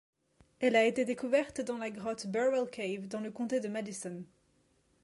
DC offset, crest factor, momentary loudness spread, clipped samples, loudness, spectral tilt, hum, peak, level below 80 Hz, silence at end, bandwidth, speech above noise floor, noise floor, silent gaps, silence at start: under 0.1%; 20 dB; 12 LU; under 0.1%; -33 LUFS; -4.5 dB/octave; none; -14 dBFS; -74 dBFS; 0.8 s; 11.5 kHz; 39 dB; -71 dBFS; none; 0.6 s